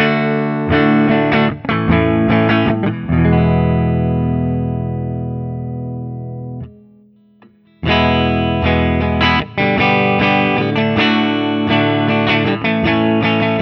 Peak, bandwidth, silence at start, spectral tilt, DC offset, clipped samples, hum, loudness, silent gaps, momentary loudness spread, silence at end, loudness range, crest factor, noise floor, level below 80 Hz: 0 dBFS; 6.2 kHz; 0 s; -8.5 dB/octave; under 0.1%; under 0.1%; none; -15 LUFS; none; 11 LU; 0 s; 8 LU; 14 dB; -48 dBFS; -32 dBFS